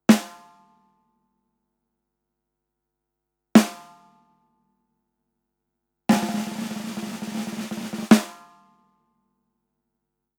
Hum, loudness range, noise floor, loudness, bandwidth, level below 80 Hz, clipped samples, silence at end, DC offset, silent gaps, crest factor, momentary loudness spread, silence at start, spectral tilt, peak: 50 Hz at -50 dBFS; 5 LU; -82 dBFS; -23 LUFS; 19 kHz; -68 dBFS; under 0.1%; 2.05 s; under 0.1%; none; 26 dB; 14 LU; 0.1 s; -5 dB/octave; 0 dBFS